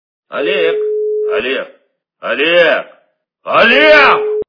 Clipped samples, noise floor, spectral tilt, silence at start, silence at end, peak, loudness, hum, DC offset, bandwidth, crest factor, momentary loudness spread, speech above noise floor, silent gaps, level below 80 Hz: 0.4%; -57 dBFS; -4.5 dB/octave; 0.3 s; 0.05 s; 0 dBFS; -11 LUFS; none; under 0.1%; 5.4 kHz; 12 dB; 17 LU; 46 dB; none; -52 dBFS